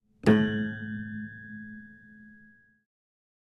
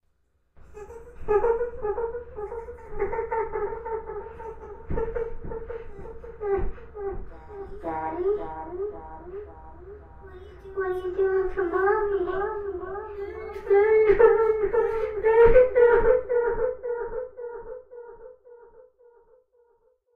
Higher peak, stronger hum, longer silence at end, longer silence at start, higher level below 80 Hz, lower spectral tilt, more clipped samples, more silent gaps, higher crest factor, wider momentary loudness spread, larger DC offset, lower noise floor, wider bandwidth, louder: about the same, -8 dBFS vs -6 dBFS; neither; second, 1.15 s vs 1.35 s; second, 0.25 s vs 0.7 s; second, -60 dBFS vs -40 dBFS; about the same, -7.5 dB/octave vs -8.5 dB/octave; neither; neither; about the same, 24 dB vs 20 dB; about the same, 22 LU vs 24 LU; neither; second, -58 dBFS vs -68 dBFS; first, 11 kHz vs 4.1 kHz; second, -28 LUFS vs -25 LUFS